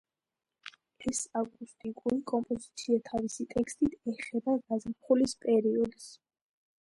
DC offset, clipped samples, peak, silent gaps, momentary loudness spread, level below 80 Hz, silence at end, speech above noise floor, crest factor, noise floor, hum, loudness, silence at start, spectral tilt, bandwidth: under 0.1%; under 0.1%; -14 dBFS; none; 17 LU; -62 dBFS; 0.7 s; over 59 dB; 18 dB; under -90 dBFS; none; -32 LUFS; 0.65 s; -4.5 dB/octave; 11.5 kHz